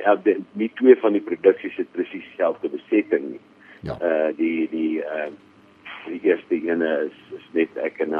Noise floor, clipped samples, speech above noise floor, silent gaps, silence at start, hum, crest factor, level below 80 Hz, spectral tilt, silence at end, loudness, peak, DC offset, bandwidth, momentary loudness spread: -42 dBFS; under 0.1%; 21 dB; none; 0 s; none; 20 dB; -62 dBFS; -8.5 dB/octave; 0 s; -22 LUFS; -2 dBFS; under 0.1%; 4.9 kHz; 15 LU